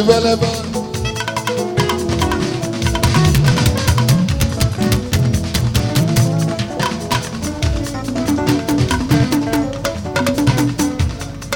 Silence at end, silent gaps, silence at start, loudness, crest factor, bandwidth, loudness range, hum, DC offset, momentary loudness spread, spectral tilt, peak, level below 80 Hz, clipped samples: 0 s; none; 0 s; -17 LUFS; 16 dB; 17.5 kHz; 3 LU; none; under 0.1%; 7 LU; -5.5 dB/octave; 0 dBFS; -28 dBFS; under 0.1%